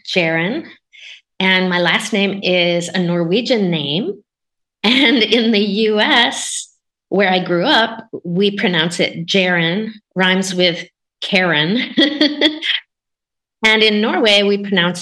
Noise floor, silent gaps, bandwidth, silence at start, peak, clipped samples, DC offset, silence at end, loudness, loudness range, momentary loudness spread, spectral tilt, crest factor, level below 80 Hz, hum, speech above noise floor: -81 dBFS; none; 12.5 kHz; 0.05 s; 0 dBFS; under 0.1%; under 0.1%; 0 s; -15 LUFS; 2 LU; 10 LU; -4 dB/octave; 16 dB; -64 dBFS; none; 66 dB